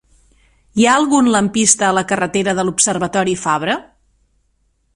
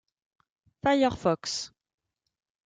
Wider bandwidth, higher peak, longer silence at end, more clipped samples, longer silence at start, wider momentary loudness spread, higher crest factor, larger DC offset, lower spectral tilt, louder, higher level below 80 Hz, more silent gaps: first, 12 kHz vs 9.4 kHz; first, 0 dBFS vs -12 dBFS; first, 1.15 s vs 1 s; neither; about the same, 0.75 s vs 0.85 s; second, 6 LU vs 10 LU; about the same, 16 dB vs 20 dB; neither; second, -3 dB/octave vs -4.5 dB/octave; first, -15 LUFS vs -27 LUFS; first, -52 dBFS vs -60 dBFS; neither